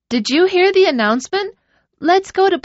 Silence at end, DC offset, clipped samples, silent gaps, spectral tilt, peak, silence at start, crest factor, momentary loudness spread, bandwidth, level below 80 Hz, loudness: 0.05 s; under 0.1%; under 0.1%; none; -1.5 dB/octave; -2 dBFS; 0.1 s; 14 dB; 10 LU; 8 kHz; -58 dBFS; -15 LUFS